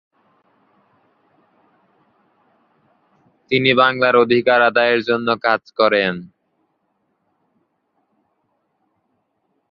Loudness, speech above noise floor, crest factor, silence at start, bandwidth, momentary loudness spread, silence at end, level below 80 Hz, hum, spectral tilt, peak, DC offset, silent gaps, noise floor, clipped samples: -16 LUFS; 54 dB; 20 dB; 3.5 s; 5.8 kHz; 6 LU; 3.45 s; -64 dBFS; none; -7.5 dB/octave; 0 dBFS; under 0.1%; none; -69 dBFS; under 0.1%